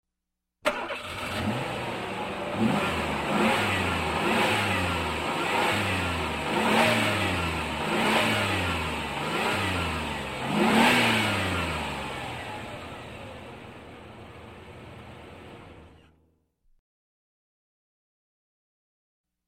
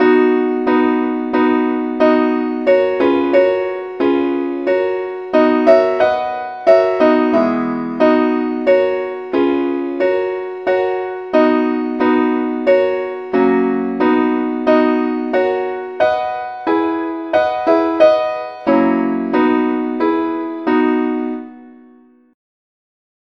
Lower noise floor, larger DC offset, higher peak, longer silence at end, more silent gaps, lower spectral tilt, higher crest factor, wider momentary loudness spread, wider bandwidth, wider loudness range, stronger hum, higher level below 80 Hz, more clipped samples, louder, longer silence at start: first, -84 dBFS vs -47 dBFS; second, under 0.1% vs 0.1%; second, -8 dBFS vs 0 dBFS; first, 3.6 s vs 1.65 s; neither; second, -4.5 dB/octave vs -7 dB/octave; about the same, 20 dB vs 16 dB; first, 22 LU vs 8 LU; first, 16.5 kHz vs 6.4 kHz; first, 18 LU vs 3 LU; neither; first, -48 dBFS vs -58 dBFS; neither; second, -26 LUFS vs -15 LUFS; first, 0.65 s vs 0 s